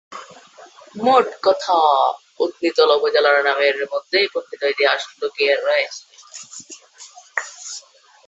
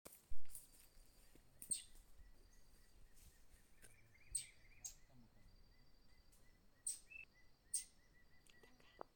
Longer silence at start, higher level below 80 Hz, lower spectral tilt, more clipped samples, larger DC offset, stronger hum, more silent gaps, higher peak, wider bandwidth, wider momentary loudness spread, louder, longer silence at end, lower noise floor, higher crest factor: about the same, 0.1 s vs 0.05 s; about the same, -72 dBFS vs -68 dBFS; about the same, -1.5 dB/octave vs -0.5 dB/octave; neither; neither; neither; neither; first, -2 dBFS vs -28 dBFS; second, 8.2 kHz vs 18 kHz; about the same, 21 LU vs 23 LU; first, -18 LUFS vs -50 LUFS; first, 0.5 s vs 0.1 s; second, -45 dBFS vs -68 dBFS; about the same, 18 dB vs 20 dB